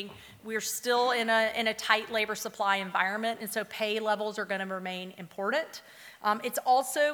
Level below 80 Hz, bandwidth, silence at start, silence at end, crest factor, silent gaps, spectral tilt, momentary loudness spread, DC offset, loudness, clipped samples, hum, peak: -74 dBFS; over 20 kHz; 0 s; 0 s; 22 dB; none; -2 dB/octave; 12 LU; under 0.1%; -29 LUFS; under 0.1%; none; -8 dBFS